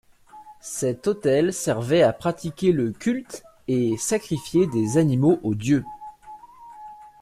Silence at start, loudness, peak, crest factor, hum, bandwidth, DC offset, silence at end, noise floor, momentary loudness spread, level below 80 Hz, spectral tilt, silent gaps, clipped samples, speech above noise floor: 0.35 s; -23 LUFS; -6 dBFS; 16 dB; none; 15 kHz; under 0.1%; 0.15 s; -47 dBFS; 22 LU; -56 dBFS; -6 dB/octave; none; under 0.1%; 25 dB